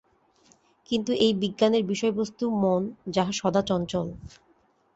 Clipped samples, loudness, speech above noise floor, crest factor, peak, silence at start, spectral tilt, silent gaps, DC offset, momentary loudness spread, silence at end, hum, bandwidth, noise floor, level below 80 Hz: under 0.1%; -26 LUFS; 39 dB; 20 dB; -8 dBFS; 0.9 s; -5.5 dB/octave; none; under 0.1%; 7 LU; 0.7 s; none; 8.2 kHz; -64 dBFS; -58 dBFS